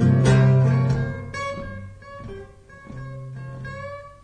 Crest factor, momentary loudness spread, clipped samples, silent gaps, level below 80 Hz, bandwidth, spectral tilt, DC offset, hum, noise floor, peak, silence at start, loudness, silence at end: 16 dB; 23 LU; under 0.1%; none; -42 dBFS; 9.4 kHz; -7.5 dB/octave; under 0.1%; none; -43 dBFS; -6 dBFS; 0 s; -20 LUFS; 0.1 s